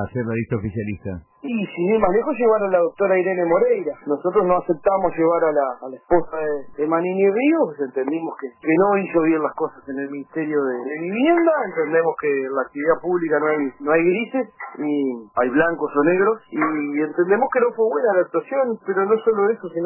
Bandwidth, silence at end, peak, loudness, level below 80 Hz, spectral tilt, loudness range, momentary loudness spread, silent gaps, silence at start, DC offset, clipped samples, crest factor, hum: 3.1 kHz; 0 s; -6 dBFS; -20 LUFS; -52 dBFS; -11.5 dB/octave; 2 LU; 9 LU; none; 0 s; under 0.1%; under 0.1%; 14 dB; none